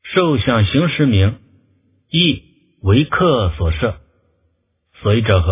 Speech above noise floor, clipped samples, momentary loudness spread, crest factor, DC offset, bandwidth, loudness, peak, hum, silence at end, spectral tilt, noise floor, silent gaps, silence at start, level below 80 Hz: 50 dB; under 0.1%; 9 LU; 16 dB; under 0.1%; 3.8 kHz; -16 LUFS; 0 dBFS; none; 0 s; -11 dB/octave; -64 dBFS; none; 0.05 s; -28 dBFS